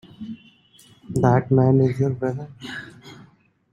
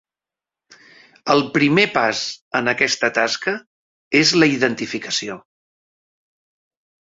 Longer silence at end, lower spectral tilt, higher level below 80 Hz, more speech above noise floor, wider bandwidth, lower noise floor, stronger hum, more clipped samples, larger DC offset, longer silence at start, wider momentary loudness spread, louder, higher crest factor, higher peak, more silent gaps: second, 0.5 s vs 1.65 s; first, -8.5 dB/octave vs -3.5 dB/octave; first, -56 dBFS vs -62 dBFS; second, 36 dB vs 71 dB; first, 10.5 kHz vs 8 kHz; second, -55 dBFS vs -89 dBFS; neither; neither; neither; second, 0.2 s vs 1.25 s; first, 20 LU vs 11 LU; about the same, -20 LUFS vs -18 LUFS; about the same, 20 dB vs 20 dB; about the same, -4 dBFS vs -2 dBFS; second, none vs 2.41-2.51 s, 3.66-4.11 s